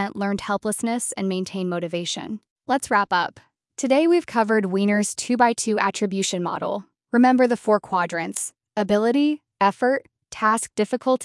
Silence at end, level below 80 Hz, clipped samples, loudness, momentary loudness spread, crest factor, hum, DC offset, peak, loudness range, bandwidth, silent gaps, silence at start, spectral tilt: 0 s; -64 dBFS; under 0.1%; -22 LUFS; 9 LU; 18 dB; none; under 0.1%; -4 dBFS; 3 LU; 12 kHz; 2.50-2.56 s; 0 s; -4.5 dB/octave